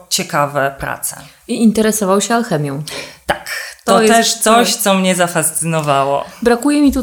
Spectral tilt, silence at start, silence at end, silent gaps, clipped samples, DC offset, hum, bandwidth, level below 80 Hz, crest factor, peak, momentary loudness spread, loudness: -3.5 dB/octave; 0.1 s; 0 s; none; under 0.1%; under 0.1%; none; over 20 kHz; -42 dBFS; 14 dB; 0 dBFS; 12 LU; -14 LUFS